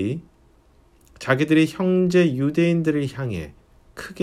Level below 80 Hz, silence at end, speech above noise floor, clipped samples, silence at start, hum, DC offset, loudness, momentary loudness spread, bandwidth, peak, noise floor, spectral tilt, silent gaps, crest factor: -52 dBFS; 0 s; 35 dB; under 0.1%; 0 s; none; under 0.1%; -20 LUFS; 16 LU; 13 kHz; -4 dBFS; -55 dBFS; -7 dB/octave; none; 18 dB